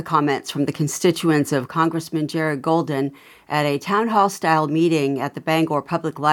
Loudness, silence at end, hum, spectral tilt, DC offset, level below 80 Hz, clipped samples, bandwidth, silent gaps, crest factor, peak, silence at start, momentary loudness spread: -21 LUFS; 0 s; none; -5.5 dB/octave; under 0.1%; -68 dBFS; under 0.1%; 18 kHz; none; 18 dB; -2 dBFS; 0 s; 7 LU